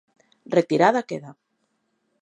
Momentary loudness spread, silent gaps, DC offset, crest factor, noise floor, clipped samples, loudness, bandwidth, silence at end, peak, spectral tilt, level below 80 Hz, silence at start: 16 LU; none; under 0.1%; 22 dB; -73 dBFS; under 0.1%; -21 LUFS; 11 kHz; 0.9 s; -4 dBFS; -6 dB/octave; -74 dBFS; 0.5 s